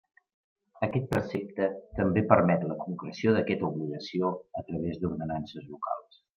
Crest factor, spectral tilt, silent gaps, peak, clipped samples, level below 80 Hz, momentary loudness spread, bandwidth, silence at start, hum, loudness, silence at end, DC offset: 24 dB; -8 dB/octave; none; -6 dBFS; under 0.1%; -58 dBFS; 14 LU; 9.6 kHz; 0.75 s; none; -30 LUFS; 0.35 s; under 0.1%